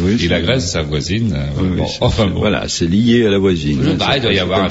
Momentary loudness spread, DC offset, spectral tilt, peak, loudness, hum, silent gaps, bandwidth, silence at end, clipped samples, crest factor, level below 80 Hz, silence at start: 6 LU; under 0.1%; -5.5 dB/octave; -2 dBFS; -15 LUFS; none; none; 8 kHz; 0 s; under 0.1%; 14 dB; -30 dBFS; 0 s